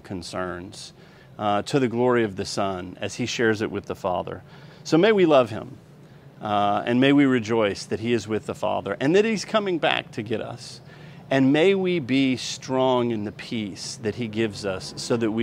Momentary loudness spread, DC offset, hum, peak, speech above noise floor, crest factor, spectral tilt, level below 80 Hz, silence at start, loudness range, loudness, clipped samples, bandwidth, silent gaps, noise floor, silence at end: 17 LU; under 0.1%; none; -2 dBFS; 24 dB; 20 dB; -5.5 dB/octave; -60 dBFS; 0.05 s; 4 LU; -23 LUFS; under 0.1%; 12.5 kHz; none; -47 dBFS; 0 s